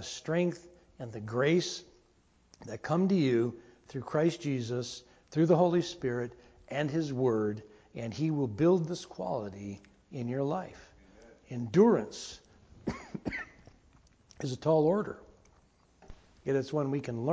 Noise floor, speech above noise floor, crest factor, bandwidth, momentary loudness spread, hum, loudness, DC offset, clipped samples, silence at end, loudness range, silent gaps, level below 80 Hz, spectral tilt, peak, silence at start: -67 dBFS; 36 dB; 20 dB; 8 kHz; 18 LU; none; -31 LUFS; under 0.1%; under 0.1%; 0 s; 3 LU; none; -62 dBFS; -6.5 dB/octave; -12 dBFS; 0 s